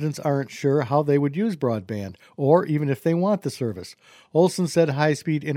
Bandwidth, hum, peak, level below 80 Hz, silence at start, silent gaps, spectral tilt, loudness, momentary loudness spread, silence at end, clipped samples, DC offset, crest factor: 16 kHz; none; -4 dBFS; -66 dBFS; 0 s; none; -7 dB/octave; -23 LUFS; 10 LU; 0 s; under 0.1%; under 0.1%; 18 dB